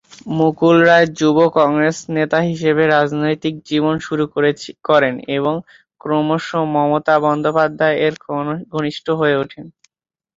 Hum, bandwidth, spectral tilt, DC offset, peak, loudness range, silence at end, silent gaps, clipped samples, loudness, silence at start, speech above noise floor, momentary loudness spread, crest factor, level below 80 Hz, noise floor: none; 7.8 kHz; -6 dB/octave; under 0.1%; -2 dBFS; 4 LU; 0.65 s; none; under 0.1%; -16 LUFS; 0.25 s; 65 dB; 10 LU; 14 dB; -58 dBFS; -81 dBFS